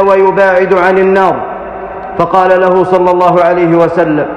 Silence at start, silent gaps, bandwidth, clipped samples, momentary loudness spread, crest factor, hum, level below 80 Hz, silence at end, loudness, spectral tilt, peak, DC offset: 0 s; none; 8.2 kHz; under 0.1%; 12 LU; 8 dB; none; -40 dBFS; 0 s; -8 LUFS; -7.5 dB/octave; 0 dBFS; under 0.1%